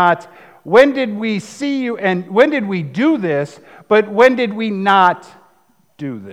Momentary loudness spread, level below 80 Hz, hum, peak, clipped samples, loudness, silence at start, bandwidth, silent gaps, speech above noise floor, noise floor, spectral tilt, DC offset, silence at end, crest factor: 10 LU; -62 dBFS; none; 0 dBFS; under 0.1%; -15 LUFS; 0 s; 11.5 kHz; none; 42 dB; -57 dBFS; -6 dB/octave; 0.1%; 0 s; 16 dB